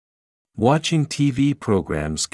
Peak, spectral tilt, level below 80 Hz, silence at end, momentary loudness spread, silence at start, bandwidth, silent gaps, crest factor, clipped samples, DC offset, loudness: -4 dBFS; -5.5 dB/octave; -46 dBFS; 0.05 s; 5 LU; 0.55 s; 12 kHz; none; 18 dB; under 0.1%; under 0.1%; -21 LUFS